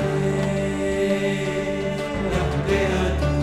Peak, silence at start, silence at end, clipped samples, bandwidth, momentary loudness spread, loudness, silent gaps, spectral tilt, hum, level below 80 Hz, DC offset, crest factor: -10 dBFS; 0 s; 0 s; under 0.1%; 14 kHz; 4 LU; -23 LUFS; none; -6.5 dB/octave; none; -32 dBFS; under 0.1%; 12 dB